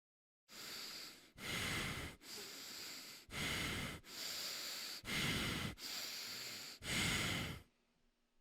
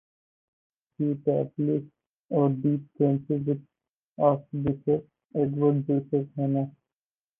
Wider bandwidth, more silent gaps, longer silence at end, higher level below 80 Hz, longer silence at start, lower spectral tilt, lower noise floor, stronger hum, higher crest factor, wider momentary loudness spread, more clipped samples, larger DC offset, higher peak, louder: first, over 20 kHz vs 3.5 kHz; second, none vs 2.09-2.29 s, 3.93-4.16 s, 5.25-5.29 s; about the same, 0.8 s vs 0.7 s; about the same, -62 dBFS vs -62 dBFS; second, 0.5 s vs 1 s; second, -2.5 dB/octave vs -13 dB/octave; second, -79 dBFS vs under -90 dBFS; neither; about the same, 18 dB vs 18 dB; first, 12 LU vs 6 LU; neither; neither; second, -26 dBFS vs -8 dBFS; second, -43 LUFS vs -27 LUFS